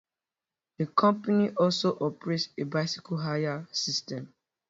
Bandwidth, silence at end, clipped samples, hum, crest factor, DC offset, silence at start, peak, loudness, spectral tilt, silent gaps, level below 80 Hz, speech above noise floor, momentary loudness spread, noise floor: 7.8 kHz; 0.4 s; under 0.1%; none; 20 dB; under 0.1%; 0.8 s; -10 dBFS; -28 LUFS; -5 dB/octave; none; -72 dBFS; over 62 dB; 8 LU; under -90 dBFS